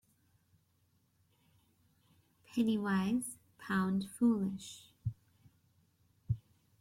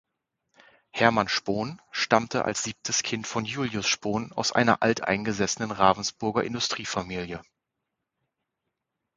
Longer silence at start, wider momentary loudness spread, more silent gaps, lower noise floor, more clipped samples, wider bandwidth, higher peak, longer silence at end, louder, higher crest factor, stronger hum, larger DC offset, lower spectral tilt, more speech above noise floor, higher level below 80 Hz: first, 2.5 s vs 0.95 s; first, 13 LU vs 9 LU; neither; second, -75 dBFS vs -83 dBFS; neither; first, 15 kHz vs 9.6 kHz; second, -20 dBFS vs -2 dBFS; second, 0.4 s vs 1.75 s; second, -36 LUFS vs -26 LUFS; second, 18 dB vs 26 dB; neither; neither; first, -6 dB/octave vs -3.5 dB/octave; second, 41 dB vs 57 dB; second, -66 dBFS vs -58 dBFS